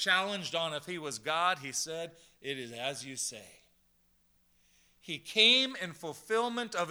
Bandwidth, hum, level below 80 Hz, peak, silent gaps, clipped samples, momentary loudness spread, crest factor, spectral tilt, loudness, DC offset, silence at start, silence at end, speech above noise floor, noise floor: over 20 kHz; 60 Hz at -75 dBFS; -78 dBFS; -10 dBFS; none; under 0.1%; 18 LU; 24 dB; -1.5 dB/octave; -31 LUFS; under 0.1%; 0 s; 0 s; 37 dB; -70 dBFS